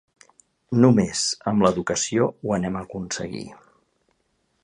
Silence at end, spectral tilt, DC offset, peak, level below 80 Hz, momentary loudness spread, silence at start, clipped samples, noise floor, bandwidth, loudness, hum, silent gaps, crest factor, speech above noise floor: 1.1 s; -5 dB/octave; under 0.1%; -2 dBFS; -54 dBFS; 14 LU; 0.7 s; under 0.1%; -70 dBFS; 11.5 kHz; -22 LUFS; none; none; 22 dB; 48 dB